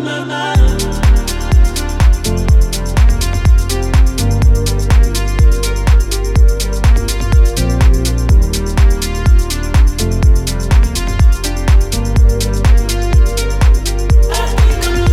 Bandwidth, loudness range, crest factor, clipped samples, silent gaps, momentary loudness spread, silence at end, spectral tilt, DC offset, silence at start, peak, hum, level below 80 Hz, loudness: 15 kHz; 1 LU; 10 dB; under 0.1%; none; 3 LU; 0 s; -5 dB/octave; under 0.1%; 0 s; 0 dBFS; none; -12 dBFS; -13 LUFS